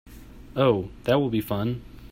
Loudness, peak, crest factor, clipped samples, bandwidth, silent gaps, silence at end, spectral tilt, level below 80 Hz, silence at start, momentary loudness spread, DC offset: -25 LUFS; -8 dBFS; 18 dB; under 0.1%; 16 kHz; none; 0.05 s; -7.5 dB/octave; -48 dBFS; 0.05 s; 10 LU; under 0.1%